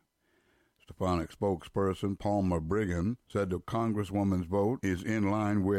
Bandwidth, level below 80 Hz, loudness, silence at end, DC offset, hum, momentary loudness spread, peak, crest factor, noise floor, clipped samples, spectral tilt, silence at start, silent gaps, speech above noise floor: 14.5 kHz; -52 dBFS; -32 LUFS; 0 s; under 0.1%; none; 4 LU; -16 dBFS; 14 dB; -72 dBFS; under 0.1%; -7.5 dB/octave; 0.9 s; none; 42 dB